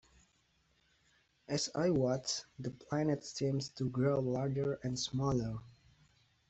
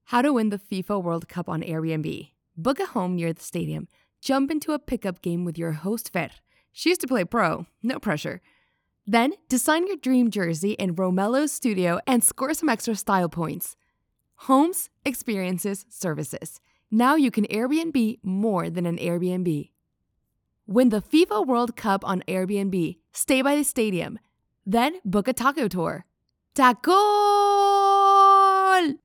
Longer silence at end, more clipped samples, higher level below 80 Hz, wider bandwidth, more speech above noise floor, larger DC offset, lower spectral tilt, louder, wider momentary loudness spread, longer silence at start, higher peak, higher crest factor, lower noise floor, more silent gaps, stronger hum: first, 0.8 s vs 0.1 s; neither; about the same, -64 dBFS vs -60 dBFS; second, 8.2 kHz vs over 20 kHz; second, 39 dB vs 52 dB; neither; about the same, -5.5 dB/octave vs -5 dB/octave; second, -36 LUFS vs -23 LUFS; second, 7 LU vs 12 LU; first, 1.5 s vs 0.1 s; second, -20 dBFS vs -4 dBFS; about the same, 16 dB vs 20 dB; about the same, -74 dBFS vs -75 dBFS; neither; neither